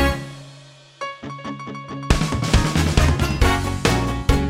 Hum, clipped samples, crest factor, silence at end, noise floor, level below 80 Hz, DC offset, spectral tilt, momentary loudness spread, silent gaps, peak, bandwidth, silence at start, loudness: none; under 0.1%; 16 dB; 0 s; -45 dBFS; -26 dBFS; under 0.1%; -5 dB/octave; 14 LU; none; -4 dBFS; 16.5 kHz; 0 s; -21 LUFS